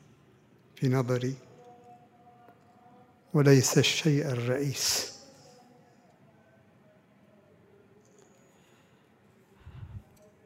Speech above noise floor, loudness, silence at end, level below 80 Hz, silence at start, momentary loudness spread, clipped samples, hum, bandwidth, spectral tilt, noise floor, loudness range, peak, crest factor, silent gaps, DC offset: 36 dB; -26 LUFS; 0.45 s; -66 dBFS; 0.8 s; 26 LU; under 0.1%; none; 16 kHz; -4.5 dB/octave; -62 dBFS; 9 LU; -8 dBFS; 24 dB; none; under 0.1%